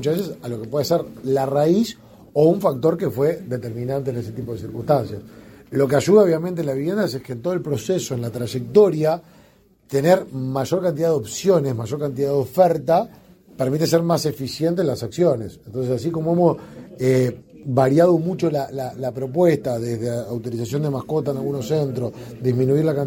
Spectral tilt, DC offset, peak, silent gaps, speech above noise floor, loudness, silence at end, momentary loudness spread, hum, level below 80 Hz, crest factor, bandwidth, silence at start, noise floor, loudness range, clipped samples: -7 dB/octave; under 0.1%; -2 dBFS; none; 34 dB; -21 LUFS; 0 s; 11 LU; none; -56 dBFS; 18 dB; 17 kHz; 0 s; -54 dBFS; 3 LU; under 0.1%